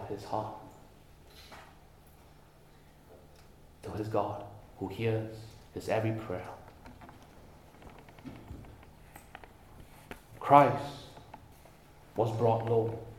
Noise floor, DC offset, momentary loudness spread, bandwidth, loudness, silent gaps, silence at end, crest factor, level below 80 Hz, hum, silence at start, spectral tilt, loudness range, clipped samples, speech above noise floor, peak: -58 dBFS; under 0.1%; 25 LU; 17 kHz; -31 LUFS; none; 0 s; 30 dB; -60 dBFS; none; 0 s; -7.5 dB/octave; 21 LU; under 0.1%; 28 dB; -6 dBFS